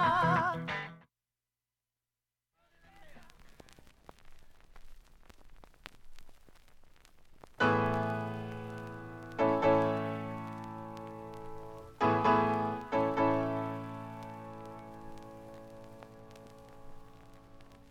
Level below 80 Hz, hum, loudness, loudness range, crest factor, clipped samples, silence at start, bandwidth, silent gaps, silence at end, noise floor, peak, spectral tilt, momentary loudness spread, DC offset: -58 dBFS; none; -32 LUFS; 16 LU; 20 dB; under 0.1%; 0 s; 15.5 kHz; none; 0.1 s; under -90 dBFS; -16 dBFS; -7 dB/octave; 25 LU; under 0.1%